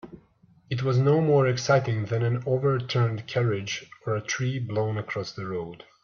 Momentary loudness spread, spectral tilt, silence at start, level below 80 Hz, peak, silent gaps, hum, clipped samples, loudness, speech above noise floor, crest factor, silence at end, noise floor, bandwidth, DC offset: 11 LU; -6 dB/octave; 0.05 s; -62 dBFS; -8 dBFS; none; none; under 0.1%; -26 LUFS; 34 dB; 18 dB; 0.2 s; -59 dBFS; 7 kHz; under 0.1%